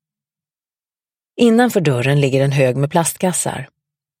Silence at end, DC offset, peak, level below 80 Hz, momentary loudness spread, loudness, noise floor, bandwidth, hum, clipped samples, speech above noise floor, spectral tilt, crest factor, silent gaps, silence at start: 0.55 s; under 0.1%; 0 dBFS; -58 dBFS; 9 LU; -16 LUFS; under -90 dBFS; 16.5 kHz; none; under 0.1%; over 75 dB; -5.5 dB/octave; 18 dB; none; 1.35 s